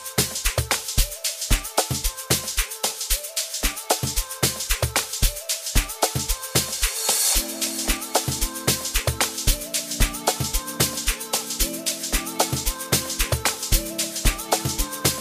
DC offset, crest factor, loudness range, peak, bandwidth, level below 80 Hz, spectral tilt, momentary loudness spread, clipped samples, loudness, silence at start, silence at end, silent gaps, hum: under 0.1%; 20 dB; 2 LU; -4 dBFS; 15.5 kHz; -30 dBFS; -2 dB/octave; 4 LU; under 0.1%; -23 LUFS; 0 s; 0 s; none; none